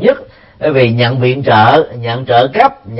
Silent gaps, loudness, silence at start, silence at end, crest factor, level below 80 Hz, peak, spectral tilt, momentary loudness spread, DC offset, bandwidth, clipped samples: none; -11 LUFS; 0 s; 0 s; 10 dB; -46 dBFS; 0 dBFS; -8.5 dB/octave; 10 LU; under 0.1%; 5.8 kHz; 0.2%